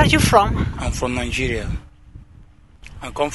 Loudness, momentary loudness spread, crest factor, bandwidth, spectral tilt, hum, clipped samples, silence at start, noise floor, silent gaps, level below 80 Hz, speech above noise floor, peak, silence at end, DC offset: -19 LUFS; 19 LU; 20 dB; 12 kHz; -5 dB/octave; none; under 0.1%; 0 s; -47 dBFS; none; -30 dBFS; 28 dB; 0 dBFS; 0 s; 0.2%